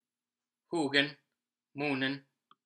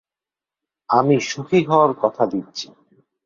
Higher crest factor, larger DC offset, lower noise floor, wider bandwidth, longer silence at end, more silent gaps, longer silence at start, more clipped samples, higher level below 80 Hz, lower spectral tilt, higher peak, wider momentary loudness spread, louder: first, 26 dB vs 20 dB; neither; about the same, under -90 dBFS vs -90 dBFS; first, 10 kHz vs 7.6 kHz; second, 0.45 s vs 0.6 s; neither; second, 0.7 s vs 0.9 s; neither; second, under -90 dBFS vs -64 dBFS; second, -4.5 dB/octave vs -6 dB/octave; second, -10 dBFS vs -2 dBFS; second, 13 LU vs 16 LU; second, -32 LUFS vs -18 LUFS